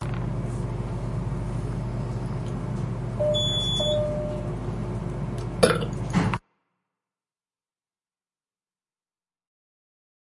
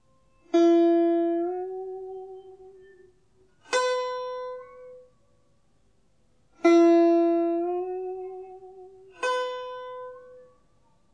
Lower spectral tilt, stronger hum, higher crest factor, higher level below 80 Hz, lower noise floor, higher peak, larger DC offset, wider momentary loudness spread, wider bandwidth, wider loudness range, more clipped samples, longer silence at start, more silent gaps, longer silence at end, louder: first, -5.5 dB/octave vs -3.5 dB/octave; neither; first, 26 dB vs 18 dB; first, -40 dBFS vs -72 dBFS; first, under -90 dBFS vs -67 dBFS; first, -4 dBFS vs -8 dBFS; neither; second, 9 LU vs 23 LU; first, 11.5 kHz vs 9.2 kHz; second, 6 LU vs 9 LU; neither; second, 0 s vs 0.55 s; neither; first, 4 s vs 0.75 s; second, -27 LUFS vs -24 LUFS